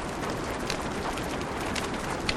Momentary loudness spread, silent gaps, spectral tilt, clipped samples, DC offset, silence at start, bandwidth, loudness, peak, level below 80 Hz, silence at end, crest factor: 2 LU; none; -4 dB/octave; under 0.1%; under 0.1%; 0 s; 16 kHz; -31 LUFS; -12 dBFS; -44 dBFS; 0 s; 20 dB